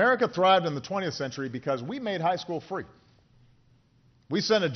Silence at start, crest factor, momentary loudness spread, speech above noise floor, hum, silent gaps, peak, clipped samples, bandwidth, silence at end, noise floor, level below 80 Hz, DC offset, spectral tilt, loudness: 0 s; 18 dB; 12 LU; 36 dB; none; none; -10 dBFS; under 0.1%; 6.6 kHz; 0 s; -63 dBFS; -68 dBFS; under 0.1%; -3 dB/octave; -28 LUFS